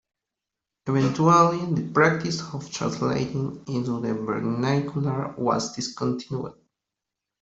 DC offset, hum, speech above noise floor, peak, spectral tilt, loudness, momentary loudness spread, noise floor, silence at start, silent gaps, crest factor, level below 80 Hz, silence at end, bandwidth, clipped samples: under 0.1%; none; 62 dB; -4 dBFS; -6 dB/octave; -24 LUFS; 12 LU; -86 dBFS; 0.85 s; none; 20 dB; -60 dBFS; 0.9 s; 8 kHz; under 0.1%